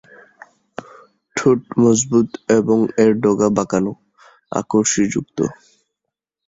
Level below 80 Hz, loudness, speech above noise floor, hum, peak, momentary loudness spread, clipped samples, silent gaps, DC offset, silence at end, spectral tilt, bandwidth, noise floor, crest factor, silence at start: -56 dBFS; -17 LUFS; 65 dB; none; -2 dBFS; 12 LU; under 0.1%; none; under 0.1%; 0.95 s; -5.5 dB/octave; 8 kHz; -81 dBFS; 18 dB; 1.35 s